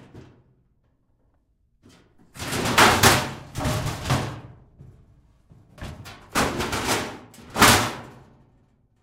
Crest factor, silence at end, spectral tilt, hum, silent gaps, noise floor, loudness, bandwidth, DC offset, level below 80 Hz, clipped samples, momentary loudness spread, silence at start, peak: 22 dB; 0.85 s; -3 dB/octave; none; none; -65 dBFS; -21 LUFS; 16 kHz; under 0.1%; -44 dBFS; under 0.1%; 24 LU; 0.15 s; -2 dBFS